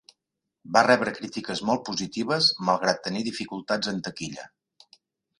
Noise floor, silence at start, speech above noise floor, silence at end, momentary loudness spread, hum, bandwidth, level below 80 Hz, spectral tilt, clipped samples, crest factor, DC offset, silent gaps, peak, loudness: -84 dBFS; 0.65 s; 58 dB; 0.95 s; 13 LU; none; 11.5 kHz; -66 dBFS; -3.5 dB/octave; under 0.1%; 24 dB; under 0.1%; none; -4 dBFS; -25 LUFS